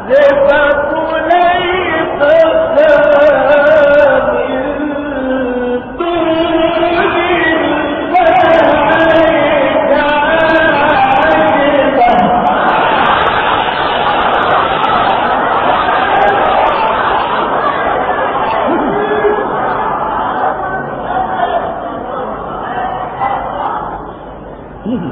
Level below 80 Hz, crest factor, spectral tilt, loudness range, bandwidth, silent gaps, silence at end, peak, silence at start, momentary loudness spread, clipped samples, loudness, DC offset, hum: -36 dBFS; 10 dB; -7 dB/octave; 8 LU; 6.2 kHz; none; 0 s; 0 dBFS; 0 s; 10 LU; 0.2%; -11 LUFS; under 0.1%; none